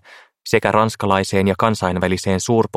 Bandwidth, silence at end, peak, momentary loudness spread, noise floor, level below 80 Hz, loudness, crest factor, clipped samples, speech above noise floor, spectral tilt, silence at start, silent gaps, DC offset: 15.5 kHz; 0 s; 0 dBFS; 3 LU; -38 dBFS; -50 dBFS; -18 LUFS; 18 dB; under 0.1%; 21 dB; -5.5 dB/octave; 0.1 s; none; under 0.1%